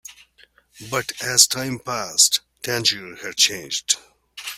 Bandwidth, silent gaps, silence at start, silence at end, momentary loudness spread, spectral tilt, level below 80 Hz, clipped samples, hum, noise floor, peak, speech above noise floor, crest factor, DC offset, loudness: 16 kHz; none; 0.1 s; 0 s; 12 LU; -0.5 dB/octave; -62 dBFS; under 0.1%; none; -56 dBFS; 0 dBFS; 34 dB; 24 dB; under 0.1%; -19 LUFS